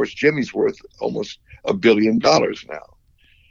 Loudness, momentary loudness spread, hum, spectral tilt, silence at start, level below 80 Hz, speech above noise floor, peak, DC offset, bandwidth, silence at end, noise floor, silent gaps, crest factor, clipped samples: -19 LUFS; 17 LU; none; -5 dB/octave; 0 s; -56 dBFS; 36 dB; -2 dBFS; under 0.1%; 7.6 kHz; 0.7 s; -55 dBFS; none; 18 dB; under 0.1%